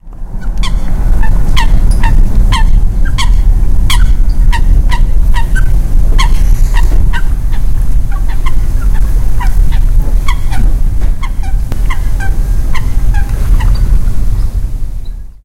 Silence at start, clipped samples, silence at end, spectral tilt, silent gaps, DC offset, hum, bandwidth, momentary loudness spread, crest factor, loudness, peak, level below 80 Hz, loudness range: 0.05 s; 3%; 0.15 s; -5 dB/octave; none; under 0.1%; none; 13 kHz; 6 LU; 6 dB; -14 LUFS; 0 dBFS; -8 dBFS; 3 LU